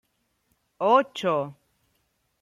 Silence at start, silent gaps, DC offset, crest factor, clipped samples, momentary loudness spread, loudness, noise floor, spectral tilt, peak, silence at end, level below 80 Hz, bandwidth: 0.8 s; none; under 0.1%; 22 dB; under 0.1%; 9 LU; -24 LUFS; -72 dBFS; -5.5 dB/octave; -6 dBFS; 0.9 s; -74 dBFS; 13 kHz